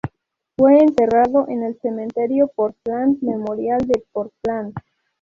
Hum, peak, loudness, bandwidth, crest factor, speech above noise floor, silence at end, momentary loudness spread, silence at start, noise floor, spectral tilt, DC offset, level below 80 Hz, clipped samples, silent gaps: none; -2 dBFS; -18 LUFS; 7.2 kHz; 16 dB; 43 dB; 0.45 s; 15 LU; 0.05 s; -61 dBFS; -8.5 dB/octave; under 0.1%; -52 dBFS; under 0.1%; none